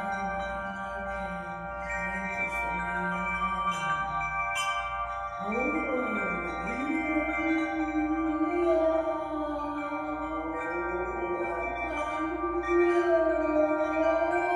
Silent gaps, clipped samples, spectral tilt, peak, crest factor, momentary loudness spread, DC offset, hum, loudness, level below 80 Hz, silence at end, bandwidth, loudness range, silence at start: none; under 0.1%; -5.5 dB/octave; -14 dBFS; 16 dB; 8 LU; under 0.1%; none; -29 LUFS; -48 dBFS; 0 s; 12 kHz; 4 LU; 0 s